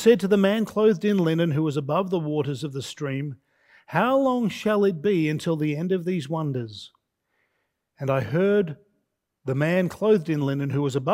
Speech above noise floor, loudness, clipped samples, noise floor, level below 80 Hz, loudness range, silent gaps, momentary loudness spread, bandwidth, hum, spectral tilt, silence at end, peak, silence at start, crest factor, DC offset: 53 dB; -24 LUFS; under 0.1%; -76 dBFS; -66 dBFS; 4 LU; none; 11 LU; 16 kHz; none; -7 dB/octave; 0 s; -6 dBFS; 0 s; 18 dB; under 0.1%